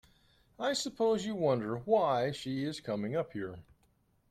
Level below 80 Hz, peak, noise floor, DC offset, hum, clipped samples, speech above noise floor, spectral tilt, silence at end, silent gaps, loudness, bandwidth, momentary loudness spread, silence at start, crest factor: -68 dBFS; -14 dBFS; -71 dBFS; under 0.1%; none; under 0.1%; 39 dB; -5 dB/octave; 0.7 s; none; -33 LUFS; 14 kHz; 10 LU; 0.6 s; 20 dB